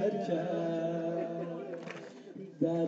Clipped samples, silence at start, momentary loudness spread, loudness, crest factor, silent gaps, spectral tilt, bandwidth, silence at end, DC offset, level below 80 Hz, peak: under 0.1%; 0 s; 14 LU; -35 LUFS; 16 dB; none; -8 dB/octave; 7.8 kHz; 0 s; under 0.1%; -84 dBFS; -18 dBFS